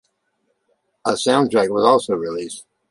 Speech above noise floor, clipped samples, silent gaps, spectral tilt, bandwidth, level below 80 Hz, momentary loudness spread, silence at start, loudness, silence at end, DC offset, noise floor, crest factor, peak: 52 dB; under 0.1%; none; -4.5 dB/octave; 11.5 kHz; -62 dBFS; 14 LU; 1.05 s; -18 LUFS; 0.3 s; under 0.1%; -70 dBFS; 18 dB; -2 dBFS